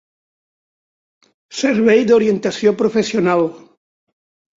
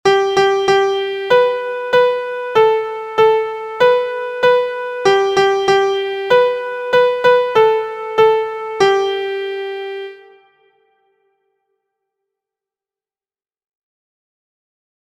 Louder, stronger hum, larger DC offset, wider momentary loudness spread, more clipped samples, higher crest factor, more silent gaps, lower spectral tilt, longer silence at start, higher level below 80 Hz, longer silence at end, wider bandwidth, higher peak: about the same, -15 LUFS vs -15 LUFS; neither; neither; about the same, 8 LU vs 9 LU; neither; about the same, 16 dB vs 16 dB; neither; first, -5.5 dB/octave vs -3.5 dB/octave; first, 1.5 s vs 0.05 s; about the same, -60 dBFS vs -58 dBFS; second, 1 s vs 4.9 s; second, 7.8 kHz vs 9.8 kHz; about the same, -2 dBFS vs 0 dBFS